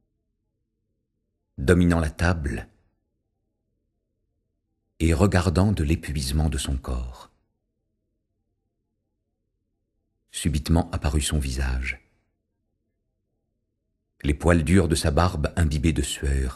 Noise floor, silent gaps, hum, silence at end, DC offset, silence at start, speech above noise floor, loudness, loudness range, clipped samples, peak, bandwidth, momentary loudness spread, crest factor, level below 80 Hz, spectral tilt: -77 dBFS; none; none; 0 s; under 0.1%; 1.6 s; 55 dB; -24 LUFS; 8 LU; under 0.1%; -2 dBFS; 12.5 kHz; 11 LU; 24 dB; -32 dBFS; -6 dB/octave